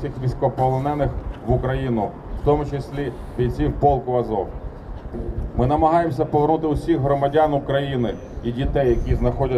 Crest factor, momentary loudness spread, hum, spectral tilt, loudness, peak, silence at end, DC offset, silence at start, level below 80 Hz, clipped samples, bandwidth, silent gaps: 16 dB; 11 LU; none; -9 dB/octave; -22 LUFS; -6 dBFS; 0 s; under 0.1%; 0 s; -30 dBFS; under 0.1%; 9.8 kHz; none